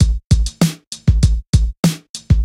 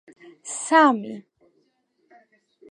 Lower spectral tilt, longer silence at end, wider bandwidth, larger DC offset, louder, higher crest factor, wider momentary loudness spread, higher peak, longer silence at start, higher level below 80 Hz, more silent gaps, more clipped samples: first, -6 dB/octave vs -3 dB/octave; second, 0 s vs 1.5 s; first, 16 kHz vs 11 kHz; neither; first, -17 LUFS vs -20 LUFS; second, 14 dB vs 22 dB; second, 4 LU vs 24 LU; first, 0 dBFS vs -4 dBFS; second, 0 s vs 0.25 s; first, -18 dBFS vs -86 dBFS; first, 0.24-0.30 s, 0.87-0.91 s, 1.48-1.53 s, 1.77-1.83 s, 2.10-2.14 s vs none; neither